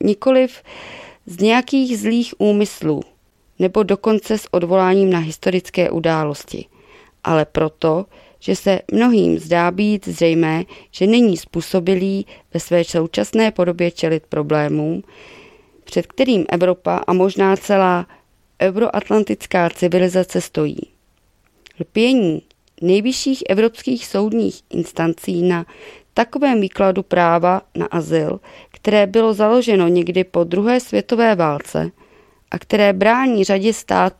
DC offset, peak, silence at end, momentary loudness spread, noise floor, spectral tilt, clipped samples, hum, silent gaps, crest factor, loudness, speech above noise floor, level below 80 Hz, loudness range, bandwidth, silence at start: under 0.1%; 0 dBFS; 0.1 s; 10 LU; -59 dBFS; -6 dB/octave; under 0.1%; none; none; 18 dB; -17 LUFS; 42 dB; -52 dBFS; 3 LU; 15 kHz; 0 s